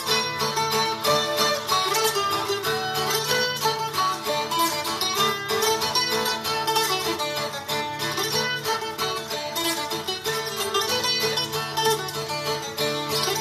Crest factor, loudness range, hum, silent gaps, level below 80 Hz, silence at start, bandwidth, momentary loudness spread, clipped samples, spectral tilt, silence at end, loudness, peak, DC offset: 16 dB; 3 LU; none; none; -62 dBFS; 0 s; 15 kHz; 5 LU; under 0.1%; -2 dB/octave; 0 s; -23 LUFS; -8 dBFS; under 0.1%